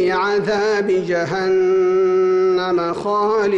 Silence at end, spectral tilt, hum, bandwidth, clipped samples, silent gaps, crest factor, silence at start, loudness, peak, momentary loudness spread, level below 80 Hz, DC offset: 0 s; -6 dB/octave; none; 7.8 kHz; under 0.1%; none; 6 dB; 0 s; -17 LUFS; -10 dBFS; 4 LU; -54 dBFS; under 0.1%